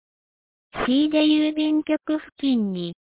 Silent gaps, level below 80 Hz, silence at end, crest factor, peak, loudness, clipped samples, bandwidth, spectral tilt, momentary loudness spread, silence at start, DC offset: 2.32-2.36 s; -56 dBFS; 0.2 s; 14 dB; -10 dBFS; -22 LUFS; under 0.1%; 4 kHz; -4 dB/octave; 10 LU; 0.75 s; under 0.1%